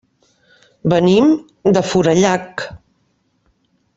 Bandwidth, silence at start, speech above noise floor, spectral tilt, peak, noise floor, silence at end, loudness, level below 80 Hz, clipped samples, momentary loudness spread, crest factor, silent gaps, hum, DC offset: 8 kHz; 0.85 s; 49 dB; -6 dB/octave; -2 dBFS; -63 dBFS; 1.2 s; -15 LUFS; -50 dBFS; under 0.1%; 15 LU; 16 dB; none; none; under 0.1%